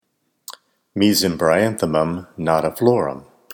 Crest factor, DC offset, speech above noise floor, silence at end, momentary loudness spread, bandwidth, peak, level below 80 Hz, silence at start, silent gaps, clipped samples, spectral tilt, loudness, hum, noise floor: 20 dB; under 0.1%; 26 dB; 0.35 s; 21 LU; 20 kHz; 0 dBFS; -52 dBFS; 0.5 s; none; under 0.1%; -5 dB/octave; -19 LUFS; none; -44 dBFS